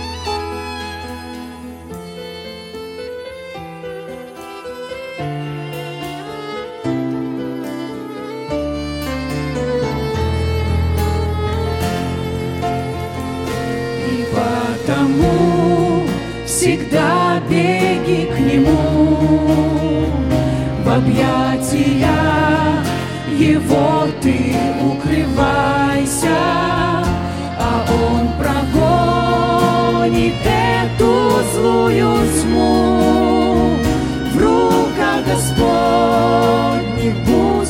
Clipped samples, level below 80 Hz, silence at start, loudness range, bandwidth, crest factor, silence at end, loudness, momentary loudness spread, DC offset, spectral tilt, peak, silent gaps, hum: under 0.1%; -32 dBFS; 0 s; 13 LU; 17 kHz; 16 dB; 0 s; -16 LUFS; 15 LU; under 0.1%; -6 dB/octave; 0 dBFS; none; none